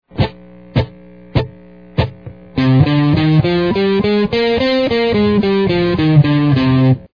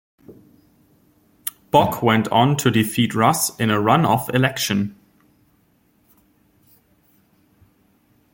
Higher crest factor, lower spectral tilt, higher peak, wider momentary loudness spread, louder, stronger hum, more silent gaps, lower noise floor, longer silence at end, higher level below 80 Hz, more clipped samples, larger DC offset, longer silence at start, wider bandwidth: second, 14 dB vs 20 dB; first, -9 dB/octave vs -5 dB/octave; about the same, 0 dBFS vs -2 dBFS; about the same, 9 LU vs 9 LU; first, -14 LUFS vs -19 LUFS; neither; neither; second, -39 dBFS vs -61 dBFS; second, 0.1 s vs 3.4 s; first, -36 dBFS vs -56 dBFS; neither; first, 0.3% vs under 0.1%; second, 0.15 s vs 0.3 s; second, 5.2 kHz vs 17 kHz